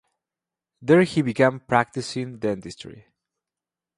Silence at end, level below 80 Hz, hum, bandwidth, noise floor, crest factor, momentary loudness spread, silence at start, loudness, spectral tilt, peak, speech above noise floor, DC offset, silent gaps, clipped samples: 1 s; -60 dBFS; none; 11.5 kHz; -89 dBFS; 22 dB; 19 LU; 0.8 s; -22 LUFS; -6.5 dB/octave; -2 dBFS; 67 dB; under 0.1%; none; under 0.1%